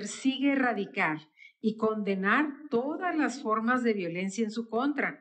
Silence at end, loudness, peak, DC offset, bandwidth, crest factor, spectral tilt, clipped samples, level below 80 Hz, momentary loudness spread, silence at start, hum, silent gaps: 0.05 s; -29 LUFS; -12 dBFS; under 0.1%; 9.2 kHz; 16 dB; -5 dB/octave; under 0.1%; -86 dBFS; 6 LU; 0 s; none; none